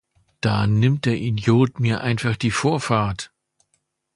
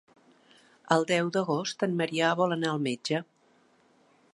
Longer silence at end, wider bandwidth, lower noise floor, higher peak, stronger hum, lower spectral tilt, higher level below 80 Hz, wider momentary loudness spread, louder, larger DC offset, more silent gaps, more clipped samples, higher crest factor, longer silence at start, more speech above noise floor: second, 0.9 s vs 1.1 s; about the same, 11.5 kHz vs 11.5 kHz; first, -71 dBFS vs -64 dBFS; first, -2 dBFS vs -8 dBFS; neither; first, -6.5 dB/octave vs -5 dB/octave; first, -48 dBFS vs -80 dBFS; about the same, 8 LU vs 6 LU; first, -21 LUFS vs -28 LUFS; neither; neither; neither; about the same, 18 dB vs 22 dB; second, 0.45 s vs 0.85 s; first, 51 dB vs 37 dB